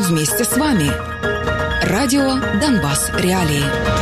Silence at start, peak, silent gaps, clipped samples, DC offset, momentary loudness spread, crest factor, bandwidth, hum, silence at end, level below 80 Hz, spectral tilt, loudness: 0 s; -6 dBFS; none; under 0.1%; under 0.1%; 4 LU; 10 dB; 15 kHz; none; 0 s; -32 dBFS; -4.5 dB/octave; -17 LUFS